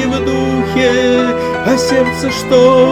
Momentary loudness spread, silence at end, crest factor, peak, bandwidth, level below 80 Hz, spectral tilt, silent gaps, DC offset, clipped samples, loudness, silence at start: 6 LU; 0 s; 12 dB; 0 dBFS; 14.5 kHz; -36 dBFS; -5 dB/octave; none; under 0.1%; under 0.1%; -12 LUFS; 0 s